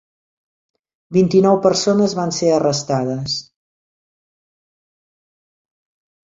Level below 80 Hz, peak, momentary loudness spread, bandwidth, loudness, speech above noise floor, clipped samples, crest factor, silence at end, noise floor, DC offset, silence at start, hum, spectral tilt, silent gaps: -58 dBFS; -2 dBFS; 9 LU; 7.8 kHz; -17 LUFS; over 74 dB; under 0.1%; 18 dB; 3 s; under -90 dBFS; under 0.1%; 1.1 s; none; -5.5 dB/octave; none